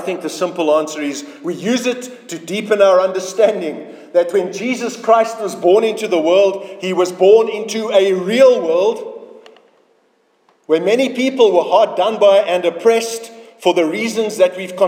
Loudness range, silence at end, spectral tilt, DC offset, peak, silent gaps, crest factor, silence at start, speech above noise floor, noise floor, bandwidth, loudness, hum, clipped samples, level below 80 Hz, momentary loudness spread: 3 LU; 0 s; -4 dB/octave; under 0.1%; 0 dBFS; none; 14 dB; 0 s; 44 dB; -59 dBFS; 16.5 kHz; -15 LUFS; none; under 0.1%; -74 dBFS; 13 LU